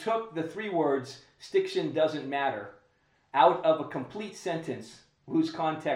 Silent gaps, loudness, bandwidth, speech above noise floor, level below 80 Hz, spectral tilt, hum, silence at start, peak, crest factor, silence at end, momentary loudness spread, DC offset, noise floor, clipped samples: none; -29 LUFS; 11.5 kHz; 39 dB; -76 dBFS; -5.5 dB/octave; none; 0 s; -8 dBFS; 22 dB; 0 s; 16 LU; under 0.1%; -68 dBFS; under 0.1%